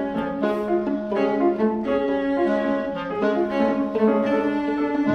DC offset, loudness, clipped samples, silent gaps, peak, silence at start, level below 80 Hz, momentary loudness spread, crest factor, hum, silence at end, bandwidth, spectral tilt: under 0.1%; -22 LUFS; under 0.1%; none; -8 dBFS; 0 s; -52 dBFS; 4 LU; 14 dB; none; 0 s; 6.6 kHz; -8 dB/octave